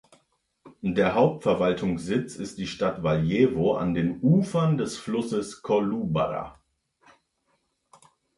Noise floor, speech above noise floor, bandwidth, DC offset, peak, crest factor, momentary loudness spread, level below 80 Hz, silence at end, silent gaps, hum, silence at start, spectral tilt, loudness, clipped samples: -73 dBFS; 48 dB; 11.5 kHz; under 0.1%; -8 dBFS; 18 dB; 9 LU; -54 dBFS; 1.85 s; none; none; 0.65 s; -7 dB/octave; -25 LUFS; under 0.1%